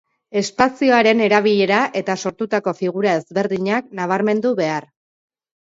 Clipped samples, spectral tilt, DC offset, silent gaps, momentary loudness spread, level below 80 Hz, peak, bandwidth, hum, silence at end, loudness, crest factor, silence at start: under 0.1%; -5 dB/octave; under 0.1%; none; 9 LU; -60 dBFS; -2 dBFS; 7.8 kHz; none; 0.85 s; -18 LUFS; 16 dB; 0.3 s